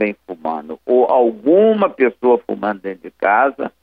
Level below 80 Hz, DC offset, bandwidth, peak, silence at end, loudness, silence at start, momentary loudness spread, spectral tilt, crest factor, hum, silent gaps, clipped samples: -64 dBFS; under 0.1%; 4.7 kHz; -2 dBFS; 0.15 s; -16 LUFS; 0 s; 13 LU; -9 dB/octave; 14 dB; none; none; under 0.1%